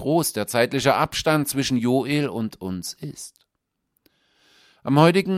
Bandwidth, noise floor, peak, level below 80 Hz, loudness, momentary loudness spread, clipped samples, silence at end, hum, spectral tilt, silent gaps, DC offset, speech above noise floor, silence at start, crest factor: 16 kHz; -78 dBFS; -2 dBFS; -56 dBFS; -22 LUFS; 18 LU; under 0.1%; 0 s; none; -5 dB/octave; none; under 0.1%; 57 dB; 0 s; 20 dB